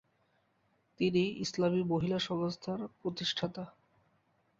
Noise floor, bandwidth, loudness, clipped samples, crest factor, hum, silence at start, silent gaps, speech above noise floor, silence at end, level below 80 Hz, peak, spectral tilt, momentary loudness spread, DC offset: -74 dBFS; 7.8 kHz; -34 LUFS; under 0.1%; 18 dB; none; 1 s; none; 41 dB; 0.9 s; -68 dBFS; -18 dBFS; -5.5 dB/octave; 9 LU; under 0.1%